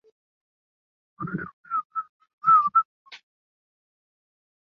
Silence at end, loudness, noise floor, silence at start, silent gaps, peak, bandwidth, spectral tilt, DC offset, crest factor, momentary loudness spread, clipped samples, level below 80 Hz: 1.55 s; -23 LUFS; under -90 dBFS; 1.2 s; 1.53-1.64 s, 1.85-1.90 s, 2.09-2.20 s, 2.33-2.38 s, 2.85-3.05 s; -10 dBFS; 5.8 kHz; -4.5 dB/octave; under 0.1%; 20 dB; 18 LU; under 0.1%; -70 dBFS